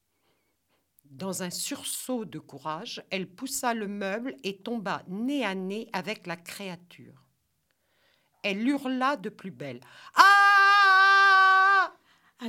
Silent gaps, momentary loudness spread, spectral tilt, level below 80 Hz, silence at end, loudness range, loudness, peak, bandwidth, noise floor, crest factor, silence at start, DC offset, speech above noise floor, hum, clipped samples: none; 21 LU; -2.5 dB/octave; -78 dBFS; 0 s; 15 LU; -23 LUFS; -2 dBFS; 17 kHz; -75 dBFS; 26 dB; 1.15 s; under 0.1%; 45 dB; none; under 0.1%